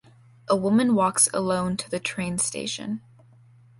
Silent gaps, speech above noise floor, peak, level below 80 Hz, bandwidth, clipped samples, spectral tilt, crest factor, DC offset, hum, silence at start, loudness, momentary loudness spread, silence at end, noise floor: none; 30 dB; -6 dBFS; -58 dBFS; 12 kHz; under 0.1%; -4 dB/octave; 20 dB; under 0.1%; none; 0.5 s; -24 LUFS; 11 LU; 0.8 s; -53 dBFS